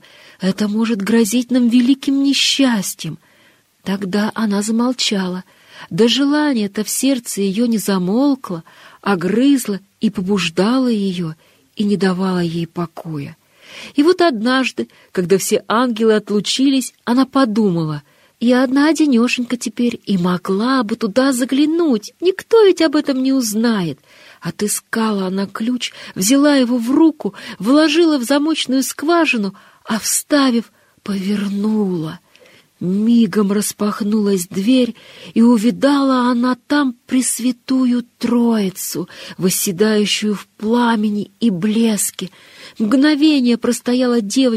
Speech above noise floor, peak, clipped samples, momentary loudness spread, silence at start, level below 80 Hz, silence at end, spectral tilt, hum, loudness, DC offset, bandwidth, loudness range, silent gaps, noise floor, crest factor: 37 dB; -2 dBFS; under 0.1%; 11 LU; 0.4 s; -62 dBFS; 0 s; -4.5 dB/octave; none; -16 LUFS; under 0.1%; 15.5 kHz; 3 LU; none; -53 dBFS; 14 dB